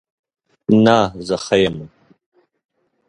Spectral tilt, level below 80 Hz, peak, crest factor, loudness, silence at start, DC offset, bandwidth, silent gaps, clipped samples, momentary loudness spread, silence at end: -6 dB/octave; -50 dBFS; 0 dBFS; 20 dB; -16 LUFS; 0.7 s; under 0.1%; 10.5 kHz; none; under 0.1%; 14 LU; 1.2 s